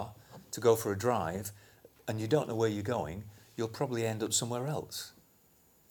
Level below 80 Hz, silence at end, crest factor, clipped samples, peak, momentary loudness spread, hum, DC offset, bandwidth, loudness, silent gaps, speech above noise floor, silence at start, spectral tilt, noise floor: -64 dBFS; 0.8 s; 22 dB; under 0.1%; -12 dBFS; 16 LU; none; under 0.1%; over 20 kHz; -33 LUFS; none; 33 dB; 0 s; -4.5 dB/octave; -65 dBFS